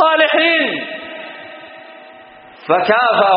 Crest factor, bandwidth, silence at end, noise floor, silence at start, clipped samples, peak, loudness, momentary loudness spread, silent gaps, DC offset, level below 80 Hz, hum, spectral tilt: 16 dB; 5.2 kHz; 0 s; -40 dBFS; 0 s; under 0.1%; 0 dBFS; -14 LUFS; 23 LU; none; under 0.1%; -68 dBFS; none; 0 dB/octave